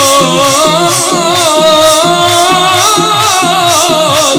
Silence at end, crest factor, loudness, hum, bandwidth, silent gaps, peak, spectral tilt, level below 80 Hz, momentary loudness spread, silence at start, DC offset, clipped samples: 0 s; 8 dB; -6 LUFS; none; over 20 kHz; none; 0 dBFS; -2 dB/octave; -44 dBFS; 2 LU; 0 s; under 0.1%; 0.3%